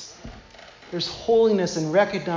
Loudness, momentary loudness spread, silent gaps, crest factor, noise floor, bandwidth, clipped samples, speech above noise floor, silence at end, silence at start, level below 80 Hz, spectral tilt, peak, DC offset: -22 LUFS; 22 LU; none; 16 dB; -46 dBFS; 7.6 kHz; under 0.1%; 25 dB; 0 s; 0 s; -52 dBFS; -5 dB/octave; -6 dBFS; under 0.1%